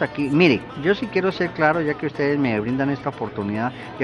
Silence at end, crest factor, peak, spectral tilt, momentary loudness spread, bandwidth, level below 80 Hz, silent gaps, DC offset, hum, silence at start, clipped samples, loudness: 0 s; 18 dB; -2 dBFS; -7.5 dB/octave; 9 LU; 10 kHz; -52 dBFS; none; under 0.1%; none; 0 s; under 0.1%; -21 LUFS